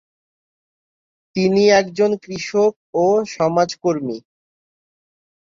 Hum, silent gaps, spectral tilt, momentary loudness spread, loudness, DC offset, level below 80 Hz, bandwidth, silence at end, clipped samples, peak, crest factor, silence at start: none; 2.76-2.93 s; -5 dB/octave; 11 LU; -18 LUFS; under 0.1%; -60 dBFS; 7.6 kHz; 1.25 s; under 0.1%; -2 dBFS; 18 dB; 1.35 s